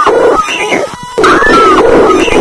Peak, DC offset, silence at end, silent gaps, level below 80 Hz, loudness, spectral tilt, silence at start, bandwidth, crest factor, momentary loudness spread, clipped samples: 0 dBFS; under 0.1%; 0 s; none; -28 dBFS; -7 LUFS; -4 dB/octave; 0 s; 11 kHz; 6 dB; 8 LU; 3%